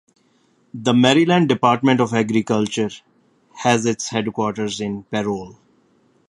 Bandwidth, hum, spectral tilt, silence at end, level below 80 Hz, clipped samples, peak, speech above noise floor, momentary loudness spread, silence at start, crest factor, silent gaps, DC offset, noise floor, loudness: 11 kHz; none; -5 dB/octave; 0.8 s; -60 dBFS; under 0.1%; 0 dBFS; 42 dB; 11 LU; 0.75 s; 20 dB; none; under 0.1%; -60 dBFS; -19 LUFS